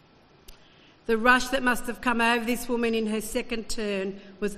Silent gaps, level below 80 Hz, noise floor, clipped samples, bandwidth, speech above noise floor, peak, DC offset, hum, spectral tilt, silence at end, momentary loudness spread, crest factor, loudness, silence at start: none; -46 dBFS; -55 dBFS; under 0.1%; 14.5 kHz; 29 dB; -4 dBFS; under 0.1%; none; -3.5 dB/octave; 0 s; 11 LU; 22 dB; -26 LUFS; 0.5 s